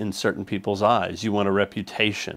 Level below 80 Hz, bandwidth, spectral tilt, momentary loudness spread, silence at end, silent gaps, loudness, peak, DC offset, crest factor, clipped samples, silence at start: -60 dBFS; 16 kHz; -5 dB/octave; 6 LU; 0 s; none; -24 LUFS; -4 dBFS; under 0.1%; 20 dB; under 0.1%; 0 s